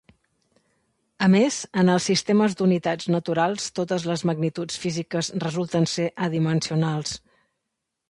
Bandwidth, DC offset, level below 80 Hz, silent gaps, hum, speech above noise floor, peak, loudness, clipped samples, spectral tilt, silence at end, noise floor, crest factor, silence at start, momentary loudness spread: 11.5 kHz; under 0.1%; -62 dBFS; none; none; 58 dB; -6 dBFS; -23 LUFS; under 0.1%; -5.5 dB/octave; 0.95 s; -81 dBFS; 18 dB; 1.2 s; 8 LU